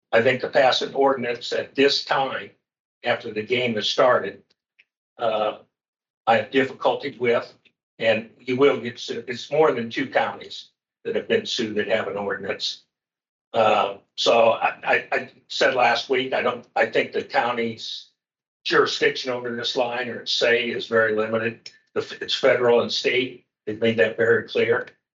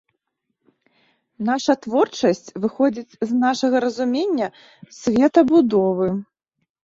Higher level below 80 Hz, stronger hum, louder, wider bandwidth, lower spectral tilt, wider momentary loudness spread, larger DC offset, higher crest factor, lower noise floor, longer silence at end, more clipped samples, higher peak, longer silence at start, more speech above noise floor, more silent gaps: second, -76 dBFS vs -60 dBFS; neither; about the same, -22 LUFS vs -20 LUFS; about the same, 7.8 kHz vs 7.8 kHz; second, -4 dB/octave vs -5.5 dB/octave; about the same, 12 LU vs 11 LU; neither; about the same, 18 dB vs 18 dB; second, -63 dBFS vs -76 dBFS; second, 0.25 s vs 0.7 s; neither; about the same, -4 dBFS vs -2 dBFS; second, 0.1 s vs 1.4 s; second, 41 dB vs 57 dB; first, 2.80-3.01 s, 4.97-5.16 s, 5.88-5.93 s, 6.10-6.24 s, 7.83-7.98 s, 13.29-13.51 s, 18.48-18.60 s vs none